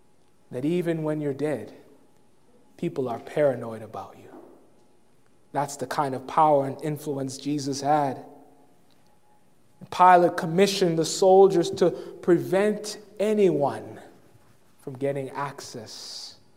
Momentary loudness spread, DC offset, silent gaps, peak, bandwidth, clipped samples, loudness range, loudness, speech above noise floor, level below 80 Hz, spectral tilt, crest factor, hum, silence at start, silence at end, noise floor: 19 LU; 0.1%; none; -4 dBFS; 16 kHz; under 0.1%; 10 LU; -24 LUFS; 40 dB; -74 dBFS; -5.5 dB/octave; 22 dB; none; 0.5 s; 0.25 s; -63 dBFS